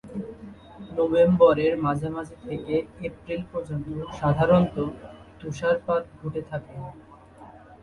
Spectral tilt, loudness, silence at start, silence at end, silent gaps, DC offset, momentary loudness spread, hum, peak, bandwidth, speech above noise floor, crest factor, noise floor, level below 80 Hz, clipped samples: -8 dB/octave; -25 LUFS; 0.05 s; 0.1 s; none; under 0.1%; 21 LU; none; -6 dBFS; 10.5 kHz; 23 dB; 20 dB; -47 dBFS; -50 dBFS; under 0.1%